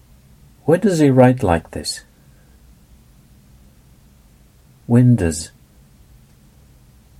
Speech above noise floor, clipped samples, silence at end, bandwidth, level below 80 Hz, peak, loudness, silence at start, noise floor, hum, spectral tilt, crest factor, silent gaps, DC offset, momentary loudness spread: 35 dB; under 0.1%; 1.7 s; 14.5 kHz; -44 dBFS; 0 dBFS; -16 LUFS; 0.65 s; -50 dBFS; none; -6.5 dB/octave; 20 dB; none; under 0.1%; 17 LU